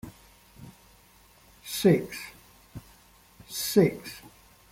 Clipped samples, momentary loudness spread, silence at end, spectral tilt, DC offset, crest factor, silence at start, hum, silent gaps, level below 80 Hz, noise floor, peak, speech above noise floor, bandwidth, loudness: under 0.1%; 27 LU; 0.45 s; -5.5 dB/octave; under 0.1%; 22 dB; 0.05 s; none; none; -60 dBFS; -58 dBFS; -8 dBFS; 32 dB; 16.5 kHz; -26 LUFS